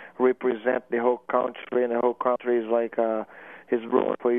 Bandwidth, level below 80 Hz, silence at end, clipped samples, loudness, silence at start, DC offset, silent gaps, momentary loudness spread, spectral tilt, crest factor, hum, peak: 3.7 kHz; -78 dBFS; 0 s; under 0.1%; -25 LUFS; 0 s; under 0.1%; none; 6 LU; -8.5 dB/octave; 18 dB; none; -8 dBFS